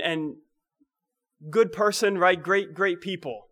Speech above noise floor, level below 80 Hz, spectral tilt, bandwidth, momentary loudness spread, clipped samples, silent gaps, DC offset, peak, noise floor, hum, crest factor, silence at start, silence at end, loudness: 60 dB; -72 dBFS; -4 dB/octave; 16 kHz; 11 LU; under 0.1%; none; under 0.1%; -8 dBFS; -85 dBFS; none; 18 dB; 0 s; 0.1 s; -24 LUFS